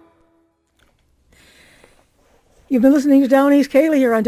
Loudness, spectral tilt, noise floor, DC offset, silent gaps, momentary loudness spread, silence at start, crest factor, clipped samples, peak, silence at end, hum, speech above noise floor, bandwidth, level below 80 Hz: -14 LUFS; -6 dB/octave; -61 dBFS; under 0.1%; none; 3 LU; 2.7 s; 16 dB; under 0.1%; -2 dBFS; 0 s; none; 48 dB; 15 kHz; -58 dBFS